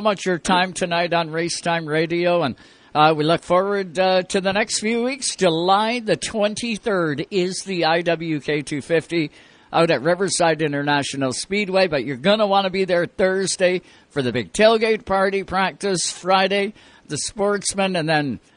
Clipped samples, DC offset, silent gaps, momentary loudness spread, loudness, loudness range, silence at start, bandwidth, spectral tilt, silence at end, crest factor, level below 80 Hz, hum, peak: under 0.1%; under 0.1%; none; 6 LU; -20 LUFS; 2 LU; 0 s; 10.5 kHz; -4 dB/octave; 0.2 s; 18 dB; -54 dBFS; none; -2 dBFS